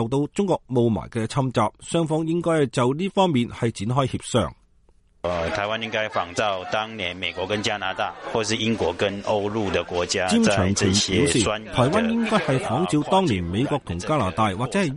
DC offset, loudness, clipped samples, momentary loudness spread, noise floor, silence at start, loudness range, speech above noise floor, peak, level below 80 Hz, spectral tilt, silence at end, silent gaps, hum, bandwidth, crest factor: under 0.1%; -23 LUFS; under 0.1%; 7 LU; -57 dBFS; 0 s; 5 LU; 35 dB; -6 dBFS; -48 dBFS; -5 dB/octave; 0 s; none; none; 11.5 kHz; 18 dB